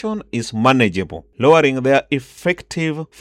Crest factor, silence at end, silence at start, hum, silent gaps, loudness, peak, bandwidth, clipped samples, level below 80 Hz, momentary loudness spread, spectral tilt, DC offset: 16 dB; 0.15 s; 0.05 s; none; none; -17 LUFS; -2 dBFS; 14 kHz; under 0.1%; -52 dBFS; 11 LU; -5.5 dB/octave; under 0.1%